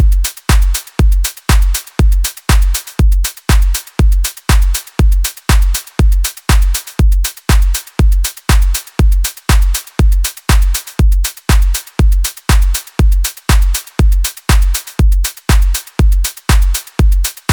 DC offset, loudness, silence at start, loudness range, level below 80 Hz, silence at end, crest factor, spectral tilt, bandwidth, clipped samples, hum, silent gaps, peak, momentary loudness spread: under 0.1%; -14 LUFS; 0 s; 0 LU; -12 dBFS; 0 s; 10 dB; -4 dB/octave; over 20 kHz; under 0.1%; none; none; 0 dBFS; 3 LU